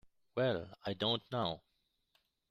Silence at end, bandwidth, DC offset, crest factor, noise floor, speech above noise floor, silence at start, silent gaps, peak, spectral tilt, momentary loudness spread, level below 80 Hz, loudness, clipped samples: 0.95 s; 13.5 kHz; under 0.1%; 20 dB; -79 dBFS; 42 dB; 0.35 s; none; -20 dBFS; -7 dB/octave; 9 LU; -70 dBFS; -37 LUFS; under 0.1%